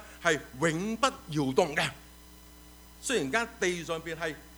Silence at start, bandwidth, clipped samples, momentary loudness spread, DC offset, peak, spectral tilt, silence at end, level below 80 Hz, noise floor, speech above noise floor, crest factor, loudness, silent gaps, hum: 0 s; over 20 kHz; under 0.1%; 8 LU; under 0.1%; -10 dBFS; -4 dB/octave; 0 s; -56 dBFS; -52 dBFS; 22 dB; 22 dB; -30 LUFS; none; none